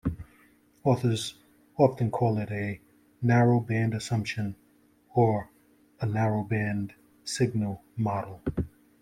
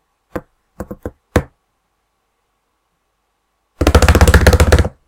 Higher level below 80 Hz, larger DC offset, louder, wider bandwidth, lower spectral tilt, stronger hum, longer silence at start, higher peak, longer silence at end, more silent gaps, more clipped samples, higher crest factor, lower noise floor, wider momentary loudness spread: second, -54 dBFS vs -18 dBFS; neither; second, -28 LUFS vs -12 LUFS; second, 13.5 kHz vs 17.5 kHz; about the same, -6.5 dB/octave vs -5.5 dB/octave; neither; second, 0.05 s vs 0.35 s; second, -8 dBFS vs 0 dBFS; first, 0.35 s vs 0.2 s; neither; second, under 0.1% vs 0.3%; about the same, 20 dB vs 16 dB; second, -63 dBFS vs -67 dBFS; second, 13 LU vs 22 LU